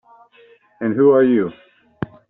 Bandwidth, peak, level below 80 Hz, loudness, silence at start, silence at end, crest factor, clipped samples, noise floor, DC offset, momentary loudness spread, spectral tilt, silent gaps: 3.9 kHz; -2 dBFS; -58 dBFS; -16 LUFS; 0.8 s; 0.25 s; 16 dB; under 0.1%; -51 dBFS; under 0.1%; 18 LU; -7.5 dB/octave; none